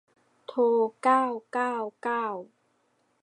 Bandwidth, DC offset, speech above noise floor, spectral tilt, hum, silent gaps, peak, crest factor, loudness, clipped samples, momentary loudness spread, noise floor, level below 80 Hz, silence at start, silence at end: 10 kHz; under 0.1%; 44 dB; -5 dB/octave; none; none; -10 dBFS; 18 dB; -27 LUFS; under 0.1%; 12 LU; -71 dBFS; -88 dBFS; 0.5 s; 0.75 s